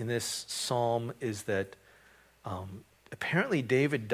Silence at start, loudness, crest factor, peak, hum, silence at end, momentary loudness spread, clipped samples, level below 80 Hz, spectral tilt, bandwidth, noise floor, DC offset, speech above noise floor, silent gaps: 0 s; -32 LUFS; 20 dB; -12 dBFS; none; 0 s; 17 LU; under 0.1%; -62 dBFS; -4.5 dB/octave; 16 kHz; -61 dBFS; under 0.1%; 29 dB; none